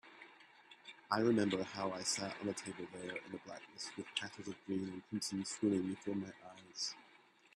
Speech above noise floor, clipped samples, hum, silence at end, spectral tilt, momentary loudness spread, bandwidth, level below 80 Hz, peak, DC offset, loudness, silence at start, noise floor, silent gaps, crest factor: 26 dB; under 0.1%; none; 0.4 s; -4 dB/octave; 20 LU; 13.5 kHz; -80 dBFS; -18 dBFS; under 0.1%; -40 LUFS; 0.05 s; -66 dBFS; none; 24 dB